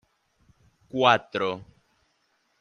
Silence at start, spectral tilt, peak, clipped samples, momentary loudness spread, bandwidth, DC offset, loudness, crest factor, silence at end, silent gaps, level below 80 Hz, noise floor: 0.95 s; -5 dB/octave; -4 dBFS; under 0.1%; 15 LU; 9.6 kHz; under 0.1%; -24 LUFS; 24 dB; 0.95 s; none; -68 dBFS; -71 dBFS